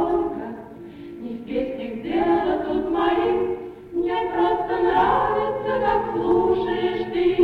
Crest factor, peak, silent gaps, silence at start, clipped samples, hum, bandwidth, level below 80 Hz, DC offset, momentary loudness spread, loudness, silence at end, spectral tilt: 14 dB; -8 dBFS; none; 0 s; under 0.1%; none; 4.9 kHz; -46 dBFS; under 0.1%; 14 LU; -22 LUFS; 0 s; -7.5 dB/octave